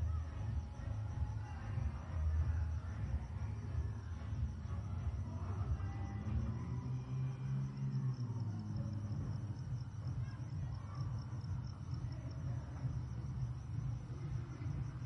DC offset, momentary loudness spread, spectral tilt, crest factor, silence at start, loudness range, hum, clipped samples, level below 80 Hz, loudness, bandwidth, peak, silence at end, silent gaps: under 0.1%; 4 LU; -8 dB/octave; 14 dB; 0 s; 3 LU; none; under 0.1%; -48 dBFS; -43 LUFS; 6.6 kHz; -28 dBFS; 0 s; none